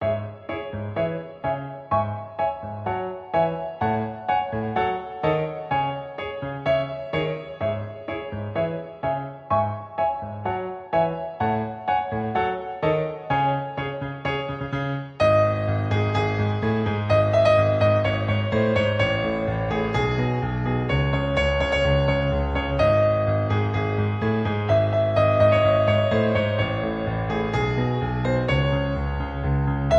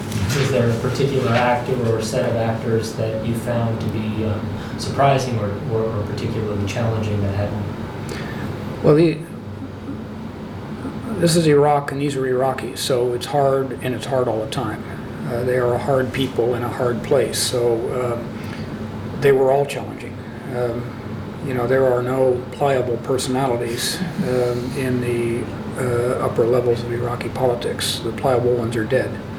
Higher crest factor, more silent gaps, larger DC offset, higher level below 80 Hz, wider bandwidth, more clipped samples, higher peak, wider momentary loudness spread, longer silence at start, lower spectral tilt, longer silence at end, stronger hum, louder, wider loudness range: about the same, 16 dB vs 18 dB; neither; neither; first, -38 dBFS vs -46 dBFS; second, 7.8 kHz vs 20 kHz; neither; second, -6 dBFS vs -2 dBFS; about the same, 10 LU vs 12 LU; about the same, 0 s vs 0 s; first, -7.5 dB/octave vs -6 dB/octave; about the same, 0 s vs 0 s; neither; second, -24 LUFS vs -21 LUFS; first, 6 LU vs 3 LU